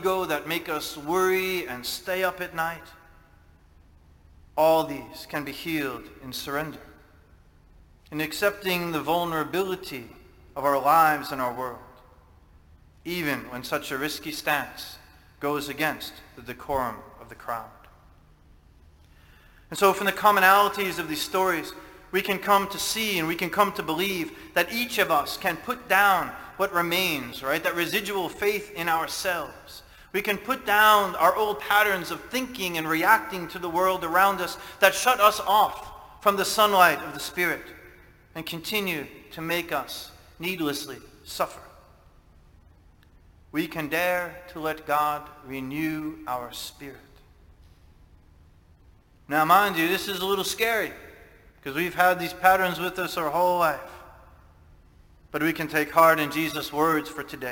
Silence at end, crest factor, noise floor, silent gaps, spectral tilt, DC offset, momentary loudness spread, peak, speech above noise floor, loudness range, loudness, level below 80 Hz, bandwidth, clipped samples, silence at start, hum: 0 s; 24 dB; -56 dBFS; none; -3.5 dB/octave; under 0.1%; 17 LU; -2 dBFS; 30 dB; 10 LU; -25 LUFS; -56 dBFS; 17 kHz; under 0.1%; 0 s; none